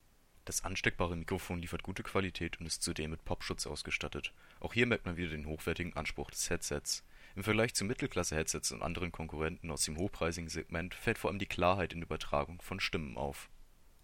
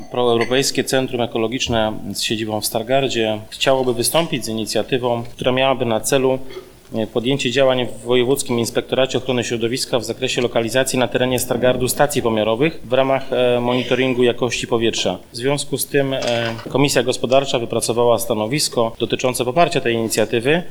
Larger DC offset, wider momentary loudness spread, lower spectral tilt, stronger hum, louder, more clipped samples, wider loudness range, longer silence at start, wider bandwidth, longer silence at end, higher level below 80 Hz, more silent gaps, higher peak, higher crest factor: neither; first, 9 LU vs 5 LU; about the same, -3.5 dB/octave vs -4 dB/octave; neither; second, -37 LUFS vs -18 LUFS; neither; about the same, 2 LU vs 2 LU; first, 0.45 s vs 0 s; second, 16.5 kHz vs over 20 kHz; first, 0.15 s vs 0 s; about the same, -50 dBFS vs -46 dBFS; neither; second, -14 dBFS vs 0 dBFS; first, 24 dB vs 18 dB